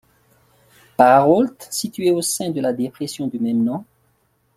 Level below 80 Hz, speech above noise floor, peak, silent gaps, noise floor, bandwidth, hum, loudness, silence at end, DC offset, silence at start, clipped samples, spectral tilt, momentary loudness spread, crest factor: -64 dBFS; 45 dB; -2 dBFS; none; -63 dBFS; 16 kHz; none; -18 LUFS; 0.75 s; under 0.1%; 1 s; under 0.1%; -4.5 dB/octave; 13 LU; 18 dB